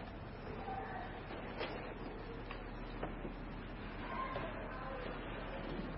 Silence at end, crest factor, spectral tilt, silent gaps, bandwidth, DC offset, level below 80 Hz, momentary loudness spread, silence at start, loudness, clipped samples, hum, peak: 0 s; 18 dB; -4.5 dB/octave; none; 5.6 kHz; under 0.1%; -52 dBFS; 5 LU; 0 s; -46 LUFS; under 0.1%; none; -28 dBFS